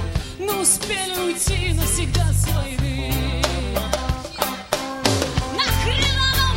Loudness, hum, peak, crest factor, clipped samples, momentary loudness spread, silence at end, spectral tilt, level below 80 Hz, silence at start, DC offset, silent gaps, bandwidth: -21 LUFS; none; 0 dBFS; 20 dB; under 0.1%; 8 LU; 0 s; -3.5 dB/octave; -28 dBFS; 0 s; under 0.1%; none; 16.5 kHz